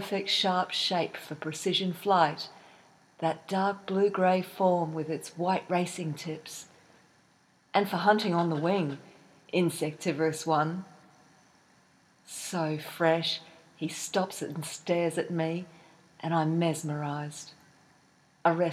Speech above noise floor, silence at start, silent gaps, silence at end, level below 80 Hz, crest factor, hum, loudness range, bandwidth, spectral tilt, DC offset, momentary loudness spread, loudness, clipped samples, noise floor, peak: 36 dB; 0 s; none; 0 s; -80 dBFS; 20 dB; none; 4 LU; 15.5 kHz; -5 dB/octave; under 0.1%; 13 LU; -29 LUFS; under 0.1%; -65 dBFS; -10 dBFS